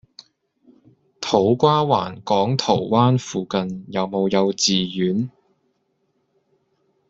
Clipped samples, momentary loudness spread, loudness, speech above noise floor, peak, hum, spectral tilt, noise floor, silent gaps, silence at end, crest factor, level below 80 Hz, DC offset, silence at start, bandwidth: under 0.1%; 9 LU; -20 LUFS; 50 dB; -2 dBFS; none; -5.5 dB/octave; -69 dBFS; none; 1.8 s; 20 dB; -60 dBFS; under 0.1%; 1.2 s; 8 kHz